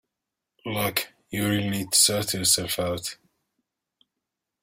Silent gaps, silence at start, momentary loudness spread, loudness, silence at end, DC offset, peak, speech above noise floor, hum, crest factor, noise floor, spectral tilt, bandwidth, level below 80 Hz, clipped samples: none; 0.65 s; 14 LU; -23 LUFS; 1.5 s; under 0.1%; -6 dBFS; 60 dB; none; 22 dB; -85 dBFS; -2.5 dB/octave; 16 kHz; -58 dBFS; under 0.1%